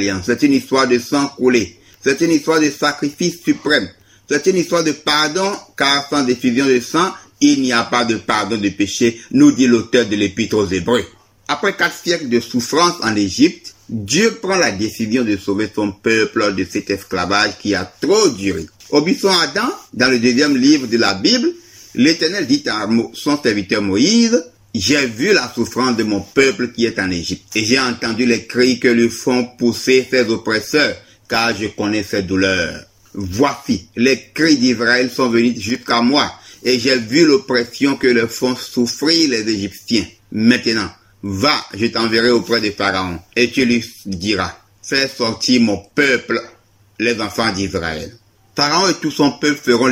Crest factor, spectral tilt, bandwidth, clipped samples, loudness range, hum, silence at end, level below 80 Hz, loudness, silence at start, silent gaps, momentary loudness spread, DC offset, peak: 16 dB; -4 dB/octave; 16.5 kHz; under 0.1%; 3 LU; none; 0 s; -50 dBFS; -16 LUFS; 0 s; none; 8 LU; under 0.1%; 0 dBFS